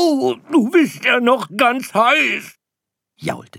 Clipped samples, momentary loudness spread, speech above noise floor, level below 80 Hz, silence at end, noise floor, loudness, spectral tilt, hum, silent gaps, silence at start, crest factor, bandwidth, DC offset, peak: under 0.1%; 12 LU; 66 dB; -68 dBFS; 0.15 s; -83 dBFS; -16 LUFS; -4 dB/octave; none; none; 0 s; 16 dB; 16.5 kHz; under 0.1%; -2 dBFS